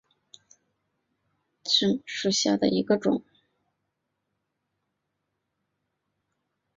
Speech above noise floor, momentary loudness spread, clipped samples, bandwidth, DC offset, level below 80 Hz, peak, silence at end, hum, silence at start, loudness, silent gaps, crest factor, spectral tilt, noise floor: 56 dB; 6 LU; under 0.1%; 7.8 kHz; under 0.1%; -70 dBFS; -8 dBFS; 3.55 s; none; 1.65 s; -25 LUFS; none; 22 dB; -4 dB/octave; -80 dBFS